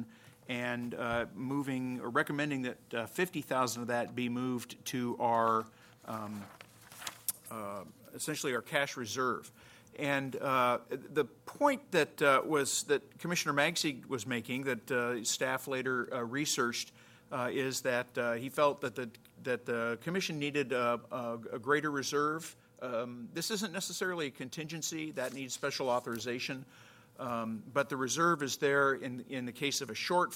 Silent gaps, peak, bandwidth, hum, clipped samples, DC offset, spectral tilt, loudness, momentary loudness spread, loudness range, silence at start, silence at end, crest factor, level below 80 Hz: none; -12 dBFS; 16.5 kHz; none; under 0.1%; under 0.1%; -3.5 dB/octave; -34 LUFS; 12 LU; 6 LU; 0 s; 0 s; 22 dB; -74 dBFS